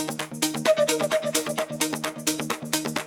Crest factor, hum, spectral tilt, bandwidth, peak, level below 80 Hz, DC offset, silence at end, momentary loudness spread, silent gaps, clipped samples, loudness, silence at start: 24 dB; none; -2.5 dB/octave; 18 kHz; -2 dBFS; -66 dBFS; under 0.1%; 0 s; 6 LU; none; under 0.1%; -25 LUFS; 0 s